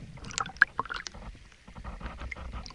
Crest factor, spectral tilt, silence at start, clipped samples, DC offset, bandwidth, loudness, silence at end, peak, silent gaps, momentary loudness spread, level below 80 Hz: 32 dB; -2.5 dB/octave; 0 s; under 0.1%; under 0.1%; 11.5 kHz; -31 LUFS; 0 s; -4 dBFS; none; 23 LU; -46 dBFS